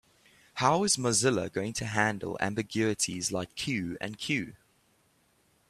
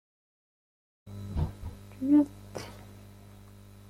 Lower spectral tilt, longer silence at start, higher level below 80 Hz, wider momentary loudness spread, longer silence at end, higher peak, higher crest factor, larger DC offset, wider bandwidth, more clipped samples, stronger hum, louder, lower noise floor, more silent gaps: second, -3.5 dB/octave vs -8 dB/octave; second, 0.55 s vs 1.05 s; second, -64 dBFS vs -48 dBFS; second, 8 LU vs 27 LU; first, 1.15 s vs 0 s; first, -8 dBFS vs -14 dBFS; about the same, 24 dB vs 20 dB; neither; about the same, 14.5 kHz vs 14 kHz; neither; second, none vs 50 Hz at -50 dBFS; about the same, -29 LUFS vs -29 LUFS; first, -68 dBFS vs -51 dBFS; neither